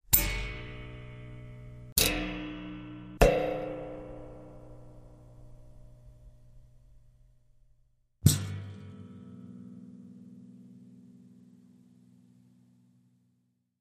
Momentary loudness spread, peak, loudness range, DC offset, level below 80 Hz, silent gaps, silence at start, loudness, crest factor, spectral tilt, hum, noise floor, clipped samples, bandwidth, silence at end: 27 LU; -2 dBFS; 22 LU; under 0.1%; -44 dBFS; 1.92-1.96 s; 0.1 s; -30 LUFS; 32 dB; -4 dB/octave; none; -75 dBFS; under 0.1%; 15 kHz; 2.35 s